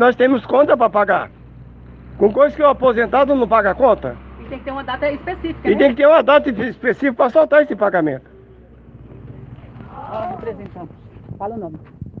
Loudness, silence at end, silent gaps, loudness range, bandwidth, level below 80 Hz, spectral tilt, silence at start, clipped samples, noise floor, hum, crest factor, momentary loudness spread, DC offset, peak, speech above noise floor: -15 LUFS; 0 s; none; 16 LU; 5.6 kHz; -44 dBFS; -8 dB/octave; 0 s; under 0.1%; -43 dBFS; none; 16 dB; 22 LU; under 0.1%; 0 dBFS; 28 dB